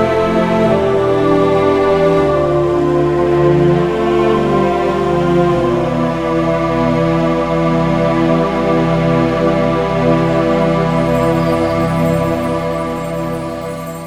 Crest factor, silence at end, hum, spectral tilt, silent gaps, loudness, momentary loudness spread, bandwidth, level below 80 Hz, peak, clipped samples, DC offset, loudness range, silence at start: 12 dB; 0 s; none; -7.5 dB/octave; none; -14 LUFS; 5 LU; 15 kHz; -34 dBFS; 0 dBFS; under 0.1%; under 0.1%; 2 LU; 0 s